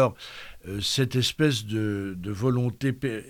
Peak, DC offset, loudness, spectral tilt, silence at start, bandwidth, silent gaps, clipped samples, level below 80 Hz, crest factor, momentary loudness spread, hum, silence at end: -10 dBFS; under 0.1%; -26 LUFS; -5 dB/octave; 0 s; 18 kHz; none; under 0.1%; -54 dBFS; 18 dB; 14 LU; none; 0 s